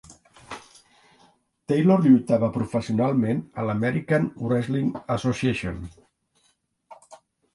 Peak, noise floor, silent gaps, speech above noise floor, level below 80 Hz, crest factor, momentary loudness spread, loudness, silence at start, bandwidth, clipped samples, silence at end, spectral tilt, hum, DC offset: -6 dBFS; -68 dBFS; none; 46 dB; -52 dBFS; 18 dB; 22 LU; -23 LUFS; 0.1 s; 11.5 kHz; under 0.1%; 0.4 s; -7.5 dB/octave; none; under 0.1%